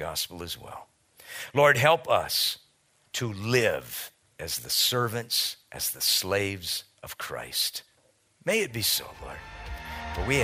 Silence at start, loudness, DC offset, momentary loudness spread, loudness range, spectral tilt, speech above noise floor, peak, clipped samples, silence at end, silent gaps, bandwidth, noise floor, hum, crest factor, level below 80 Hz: 0 s; -26 LUFS; under 0.1%; 18 LU; 5 LU; -2.5 dB/octave; 38 dB; -4 dBFS; under 0.1%; 0 s; none; 16 kHz; -66 dBFS; none; 24 dB; -50 dBFS